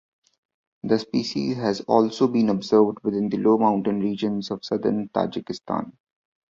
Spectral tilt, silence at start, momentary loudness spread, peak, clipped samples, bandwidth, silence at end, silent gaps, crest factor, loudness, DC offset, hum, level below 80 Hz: -7 dB/octave; 0.85 s; 10 LU; -4 dBFS; under 0.1%; 7.6 kHz; 0.6 s; none; 20 dB; -23 LUFS; under 0.1%; none; -62 dBFS